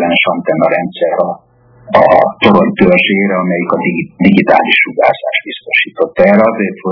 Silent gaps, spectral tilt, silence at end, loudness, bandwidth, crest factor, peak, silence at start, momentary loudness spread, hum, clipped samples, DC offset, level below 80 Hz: none; -8.5 dB/octave; 0 s; -10 LUFS; 5.4 kHz; 10 dB; 0 dBFS; 0 s; 8 LU; none; 1%; under 0.1%; -48 dBFS